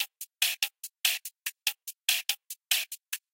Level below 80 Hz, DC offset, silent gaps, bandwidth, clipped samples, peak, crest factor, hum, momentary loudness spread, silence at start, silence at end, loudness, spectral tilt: under -90 dBFS; under 0.1%; none; 17 kHz; under 0.1%; -10 dBFS; 24 dB; none; 9 LU; 0 s; 0.15 s; -30 LUFS; 6.5 dB/octave